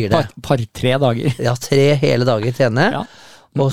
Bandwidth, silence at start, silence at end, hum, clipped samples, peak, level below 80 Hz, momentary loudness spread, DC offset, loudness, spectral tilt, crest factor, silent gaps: 15 kHz; 0 s; 0 s; none; under 0.1%; 0 dBFS; -46 dBFS; 6 LU; 1%; -17 LUFS; -6 dB/octave; 16 dB; none